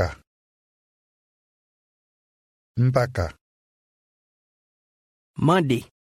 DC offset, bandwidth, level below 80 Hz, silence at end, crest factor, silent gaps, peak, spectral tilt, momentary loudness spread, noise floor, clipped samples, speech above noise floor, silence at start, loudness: under 0.1%; 14.5 kHz; -50 dBFS; 0.3 s; 22 dB; 0.27-2.75 s, 3.41-5.34 s; -6 dBFS; -7 dB/octave; 13 LU; under -90 dBFS; under 0.1%; over 69 dB; 0 s; -23 LUFS